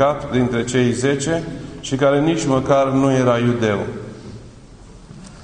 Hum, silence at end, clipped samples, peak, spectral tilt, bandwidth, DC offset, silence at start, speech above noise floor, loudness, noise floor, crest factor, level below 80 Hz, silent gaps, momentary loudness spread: none; 0 s; under 0.1%; -2 dBFS; -6 dB/octave; 10.5 kHz; under 0.1%; 0 s; 24 dB; -18 LUFS; -41 dBFS; 16 dB; -44 dBFS; none; 16 LU